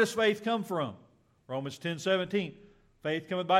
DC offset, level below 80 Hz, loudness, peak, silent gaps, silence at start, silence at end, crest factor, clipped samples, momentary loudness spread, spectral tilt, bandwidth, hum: under 0.1%; -72 dBFS; -32 LUFS; -12 dBFS; none; 0 s; 0 s; 20 dB; under 0.1%; 11 LU; -5 dB/octave; 16 kHz; none